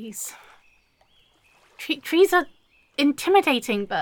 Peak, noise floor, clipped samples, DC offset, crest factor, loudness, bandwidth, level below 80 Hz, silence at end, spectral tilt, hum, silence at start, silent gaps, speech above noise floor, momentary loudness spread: -6 dBFS; -61 dBFS; under 0.1%; under 0.1%; 18 dB; -22 LUFS; 17.5 kHz; -66 dBFS; 0 s; -3 dB/octave; none; 0 s; none; 39 dB; 16 LU